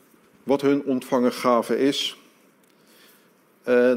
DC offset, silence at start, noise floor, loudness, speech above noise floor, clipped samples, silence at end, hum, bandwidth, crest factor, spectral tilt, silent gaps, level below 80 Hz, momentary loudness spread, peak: under 0.1%; 0.45 s; -58 dBFS; -22 LUFS; 37 dB; under 0.1%; 0 s; none; 16 kHz; 16 dB; -4.5 dB/octave; none; -70 dBFS; 8 LU; -8 dBFS